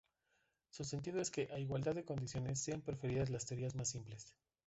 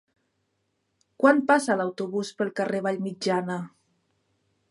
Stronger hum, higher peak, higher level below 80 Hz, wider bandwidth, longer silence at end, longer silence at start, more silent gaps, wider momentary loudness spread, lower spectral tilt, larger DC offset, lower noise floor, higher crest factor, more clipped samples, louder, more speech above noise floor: neither; second, -28 dBFS vs -6 dBFS; first, -66 dBFS vs -78 dBFS; second, 8.2 kHz vs 11.5 kHz; second, 0.35 s vs 1.05 s; second, 0.75 s vs 1.2 s; neither; about the same, 10 LU vs 10 LU; about the same, -5 dB/octave vs -5.5 dB/octave; neither; first, -82 dBFS vs -75 dBFS; second, 14 dB vs 22 dB; neither; second, -42 LUFS vs -25 LUFS; second, 40 dB vs 51 dB